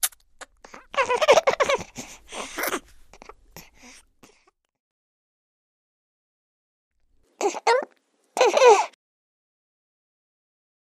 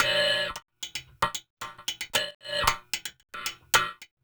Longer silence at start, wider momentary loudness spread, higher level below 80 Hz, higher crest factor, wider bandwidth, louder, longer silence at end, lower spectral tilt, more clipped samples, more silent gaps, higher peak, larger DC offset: about the same, 0 s vs 0 s; first, 21 LU vs 12 LU; second, -60 dBFS vs -50 dBFS; about the same, 24 dB vs 26 dB; second, 15.5 kHz vs over 20 kHz; first, -21 LUFS vs -28 LUFS; first, 2.1 s vs 0.2 s; about the same, -1.5 dB/octave vs -0.5 dB/octave; neither; first, 4.80-6.91 s vs 1.50-1.57 s, 2.35-2.40 s; about the same, -2 dBFS vs -4 dBFS; neither